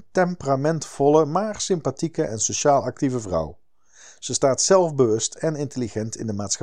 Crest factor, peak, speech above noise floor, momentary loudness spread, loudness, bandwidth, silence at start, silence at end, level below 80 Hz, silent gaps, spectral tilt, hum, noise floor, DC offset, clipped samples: 20 dB; -4 dBFS; 29 dB; 10 LU; -22 LUFS; 11 kHz; 0.15 s; 0.05 s; -54 dBFS; none; -4.5 dB/octave; none; -51 dBFS; 0.5%; under 0.1%